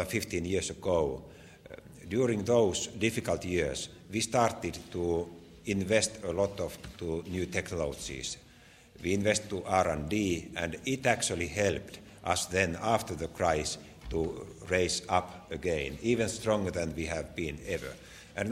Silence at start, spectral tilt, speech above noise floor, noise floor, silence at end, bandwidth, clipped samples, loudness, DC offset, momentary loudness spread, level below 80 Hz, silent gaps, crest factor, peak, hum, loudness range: 0 s; -4 dB/octave; 25 dB; -57 dBFS; 0 s; 16 kHz; under 0.1%; -32 LUFS; under 0.1%; 11 LU; -52 dBFS; none; 24 dB; -8 dBFS; none; 3 LU